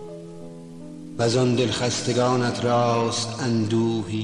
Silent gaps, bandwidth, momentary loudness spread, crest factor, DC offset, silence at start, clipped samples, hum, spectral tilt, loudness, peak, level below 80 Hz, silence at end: none; 11 kHz; 19 LU; 14 dB; 0.3%; 0 s; under 0.1%; none; -5 dB/octave; -22 LUFS; -10 dBFS; -56 dBFS; 0 s